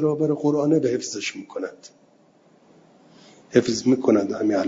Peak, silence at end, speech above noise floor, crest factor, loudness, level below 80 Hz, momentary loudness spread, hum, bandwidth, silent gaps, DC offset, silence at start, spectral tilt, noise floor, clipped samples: -4 dBFS; 0 s; 35 dB; 20 dB; -22 LUFS; -66 dBFS; 13 LU; none; 7.8 kHz; none; under 0.1%; 0 s; -5.5 dB/octave; -57 dBFS; under 0.1%